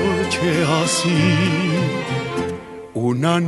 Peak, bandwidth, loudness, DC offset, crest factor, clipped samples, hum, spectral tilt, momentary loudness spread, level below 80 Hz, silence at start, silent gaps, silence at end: -4 dBFS; 11.5 kHz; -19 LUFS; under 0.1%; 16 dB; under 0.1%; none; -5 dB/octave; 9 LU; -50 dBFS; 0 s; none; 0 s